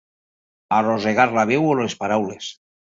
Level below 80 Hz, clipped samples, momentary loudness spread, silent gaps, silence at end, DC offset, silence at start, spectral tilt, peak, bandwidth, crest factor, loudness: -62 dBFS; under 0.1%; 11 LU; none; 0.45 s; under 0.1%; 0.7 s; -5.5 dB/octave; -2 dBFS; 7.8 kHz; 18 dB; -20 LUFS